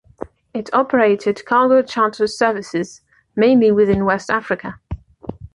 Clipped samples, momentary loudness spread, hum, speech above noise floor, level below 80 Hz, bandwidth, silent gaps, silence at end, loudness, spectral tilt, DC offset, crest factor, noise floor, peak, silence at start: under 0.1%; 20 LU; none; 19 dB; -44 dBFS; 11 kHz; none; 0.1 s; -17 LUFS; -6 dB/octave; under 0.1%; 14 dB; -35 dBFS; -2 dBFS; 0.55 s